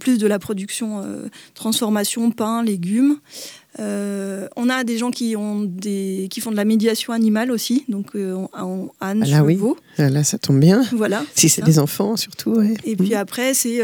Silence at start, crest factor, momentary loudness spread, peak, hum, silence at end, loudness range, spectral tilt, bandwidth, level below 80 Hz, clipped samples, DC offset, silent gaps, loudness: 0 s; 18 dB; 12 LU; -2 dBFS; none; 0 s; 6 LU; -5 dB/octave; 20 kHz; -62 dBFS; under 0.1%; under 0.1%; none; -19 LUFS